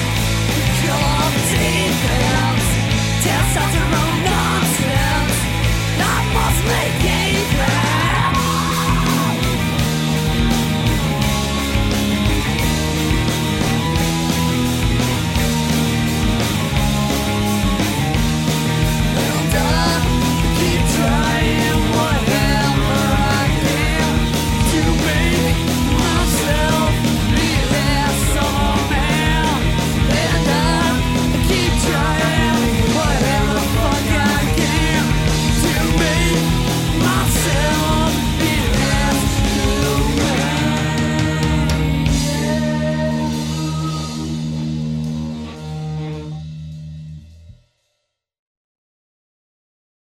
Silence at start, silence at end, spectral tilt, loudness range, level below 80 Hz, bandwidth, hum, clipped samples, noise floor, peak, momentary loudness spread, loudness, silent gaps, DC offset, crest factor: 0 s; 2.65 s; -4.5 dB/octave; 4 LU; -24 dBFS; 16.5 kHz; none; under 0.1%; -73 dBFS; -2 dBFS; 3 LU; -17 LUFS; none; under 0.1%; 14 dB